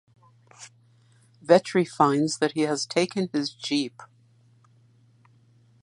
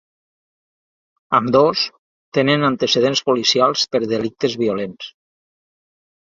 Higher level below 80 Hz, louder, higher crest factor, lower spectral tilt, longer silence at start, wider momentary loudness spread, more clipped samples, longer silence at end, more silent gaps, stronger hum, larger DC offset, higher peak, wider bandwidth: second, -74 dBFS vs -60 dBFS; second, -24 LUFS vs -17 LUFS; first, 24 dB vs 18 dB; about the same, -4.5 dB/octave vs -4 dB/octave; second, 0.6 s vs 1.3 s; first, 26 LU vs 9 LU; neither; first, 1.75 s vs 1.1 s; second, none vs 1.99-2.32 s; neither; neither; about the same, -2 dBFS vs -2 dBFS; first, 11.5 kHz vs 7.8 kHz